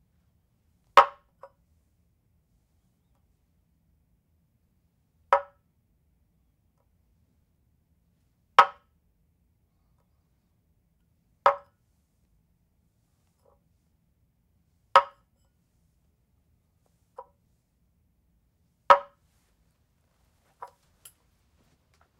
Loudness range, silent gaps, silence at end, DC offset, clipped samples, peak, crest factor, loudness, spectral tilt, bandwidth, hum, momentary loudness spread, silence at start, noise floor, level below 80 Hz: 6 LU; none; 3.2 s; under 0.1%; under 0.1%; -2 dBFS; 30 dB; -23 LUFS; -2 dB/octave; 16 kHz; none; 7 LU; 0.95 s; -70 dBFS; -72 dBFS